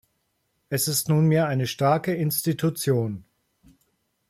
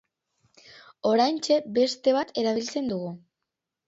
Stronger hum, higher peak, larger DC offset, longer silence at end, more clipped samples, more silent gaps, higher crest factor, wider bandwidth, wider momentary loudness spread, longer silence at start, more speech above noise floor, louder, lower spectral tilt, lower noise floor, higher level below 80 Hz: neither; about the same, -8 dBFS vs -10 dBFS; neither; first, 1.1 s vs 0.7 s; neither; neither; about the same, 16 dB vs 18 dB; first, 16 kHz vs 8 kHz; second, 7 LU vs 10 LU; about the same, 0.7 s vs 0.75 s; second, 50 dB vs 61 dB; about the same, -23 LUFS vs -25 LUFS; about the same, -5.5 dB/octave vs -4.5 dB/octave; second, -73 dBFS vs -85 dBFS; first, -62 dBFS vs -72 dBFS